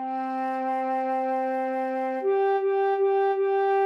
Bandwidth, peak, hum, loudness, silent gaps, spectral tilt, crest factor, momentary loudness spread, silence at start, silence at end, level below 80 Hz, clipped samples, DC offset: 5.6 kHz; -16 dBFS; none; -25 LUFS; none; -5 dB/octave; 10 dB; 5 LU; 0 s; 0 s; under -90 dBFS; under 0.1%; under 0.1%